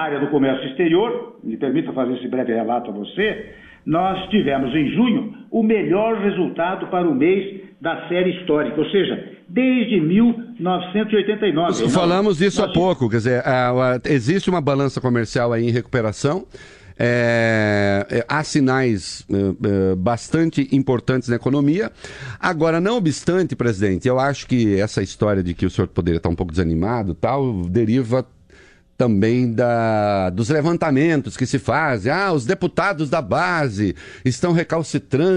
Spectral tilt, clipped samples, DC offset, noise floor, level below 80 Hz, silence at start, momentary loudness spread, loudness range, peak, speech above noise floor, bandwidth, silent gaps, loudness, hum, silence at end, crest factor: -6.5 dB/octave; under 0.1%; under 0.1%; -49 dBFS; -46 dBFS; 0 s; 6 LU; 3 LU; -4 dBFS; 30 dB; 10.5 kHz; none; -19 LUFS; none; 0 s; 14 dB